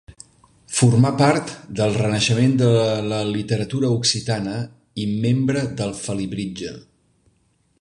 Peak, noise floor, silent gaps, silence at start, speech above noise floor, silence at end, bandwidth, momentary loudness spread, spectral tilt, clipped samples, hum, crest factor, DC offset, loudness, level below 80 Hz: -2 dBFS; -63 dBFS; none; 0.1 s; 44 dB; 1 s; 11 kHz; 12 LU; -5.5 dB/octave; under 0.1%; none; 18 dB; under 0.1%; -20 LUFS; -50 dBFS